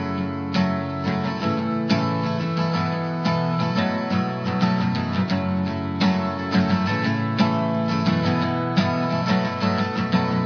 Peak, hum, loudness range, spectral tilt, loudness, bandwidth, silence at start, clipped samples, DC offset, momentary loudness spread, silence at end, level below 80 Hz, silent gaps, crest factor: -6 dBFS; none; 2 LU; -7 dB/octave; -23 LUFS; 5.4 kHz; 0 s; under 0.1%; under 0.1%; 3 LU; 0 s; -58 dBFS; none; 16 dB